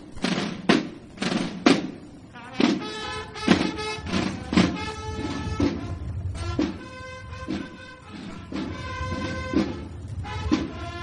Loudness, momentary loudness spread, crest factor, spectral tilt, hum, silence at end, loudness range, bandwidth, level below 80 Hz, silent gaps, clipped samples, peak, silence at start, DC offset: -27 LUFS; 16 LU; 24 dB; -5.5 dB/octave; none; 0 s; 7 LU; 11 kHz; -44 dBFS; none; under 0.1%; -2 dBFS; 0 s; under 0.1%